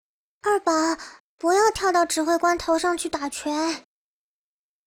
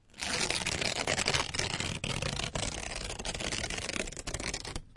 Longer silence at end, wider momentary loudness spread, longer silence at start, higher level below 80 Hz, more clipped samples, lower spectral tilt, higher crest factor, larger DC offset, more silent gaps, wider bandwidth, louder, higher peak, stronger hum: first, 1.05 s vs 0 s; about the same, 9 LU vs 7 LU; first, 0.45 s vs 0.15 s; second, -54 dBFS vs -46 dBFS; neither; about the same, -2 dB/octave vs -2 dB/octave; second, 16 dB vs 24 dB; neither; first, 1.20-1.38 s vs none; first, 18.5 kHz vs 11.5 kHz; first, -23 LUFS vs -33 LUFS; about the same, -8 dBFS vs -10 dBFS; neither